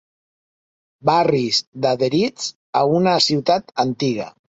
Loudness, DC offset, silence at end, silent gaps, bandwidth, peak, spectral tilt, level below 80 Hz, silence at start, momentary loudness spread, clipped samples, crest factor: -19 LUFS; under 0.1%; 0.3 s; 1.67-1.72 s, 2.55-2.73 s; 8.4 kHz; -2 dBFS; -5 dB/octave; -60 dBFS; 1.05 s; 7 LU; under 0.1%; 18 dB